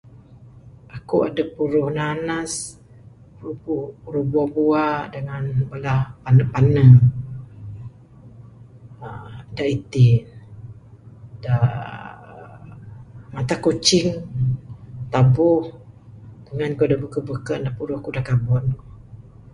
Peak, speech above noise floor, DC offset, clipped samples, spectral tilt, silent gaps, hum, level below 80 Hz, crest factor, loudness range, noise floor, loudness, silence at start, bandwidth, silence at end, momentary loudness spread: 0 dBFS; 27 dB; under 0.1%; under 0.1%; -6.5 dB/octave; none; none; -46 dBFS; 20 dB; 7 LU; -46 dBFS; -20 LUFS; 0.4 s; 11.5 kHz; 0.4 s; 23 LU